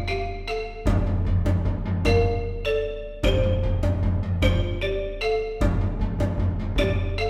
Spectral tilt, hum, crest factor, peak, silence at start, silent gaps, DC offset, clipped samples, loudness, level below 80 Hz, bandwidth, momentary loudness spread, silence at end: -7 dB/octave; none; 16 dB; -6 dBFS; 0 s; none; under 0.1%; under 0.1%; -25 LUFS; -28 dBFS; 11.5 kHz; 5 LU; 0 s